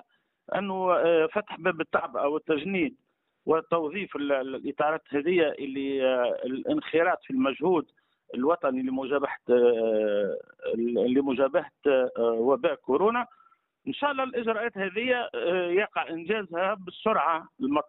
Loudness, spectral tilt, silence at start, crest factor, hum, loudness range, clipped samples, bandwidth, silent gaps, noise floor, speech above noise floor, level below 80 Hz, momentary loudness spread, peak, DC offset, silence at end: -27 LUFS; -3.5 dB/octave; 0.5 s; 16 dB; none; 3 LU; under 0.1%; 4 kHz; none; -54 dBFS; 28 dB; -70 dBFS; 7 LU; -12 dBFS; under 0.1%; 0.05 s